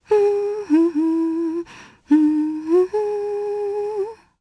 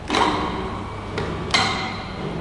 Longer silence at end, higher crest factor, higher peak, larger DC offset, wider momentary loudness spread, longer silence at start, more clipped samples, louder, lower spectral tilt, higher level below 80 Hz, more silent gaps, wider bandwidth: first, 0.25 s vs 0 s; second, 14 dB vs 22 dB; second, -6 dBFS vs -2 dBFS; neither; about the same, 9 LU vs 10 LU; about the same, 0.1 s vs 0 s; neither; first, -20 LUFS vs -23 LUFS; first, -6.5 dB/octave vs -4 dB/octave; second, -62 dBFS vs -40 dBFS; neither; about the same, 10.5 kHz vs 11.5 kHz